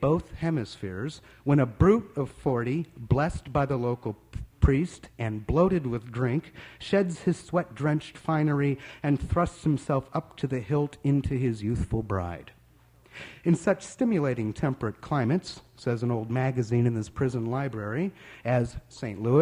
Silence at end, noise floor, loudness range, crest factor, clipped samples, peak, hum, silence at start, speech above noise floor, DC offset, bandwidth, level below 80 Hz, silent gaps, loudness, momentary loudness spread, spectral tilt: 0 s; -58 dBFS; 3 LU; 20 dB; under 0.1%; -8 dBFS; none; 0 s; 31 dB; under 0.1%; 11 kHz; -42 dBFS; none; -28 LUFS; 10 LU; -8 dB/octave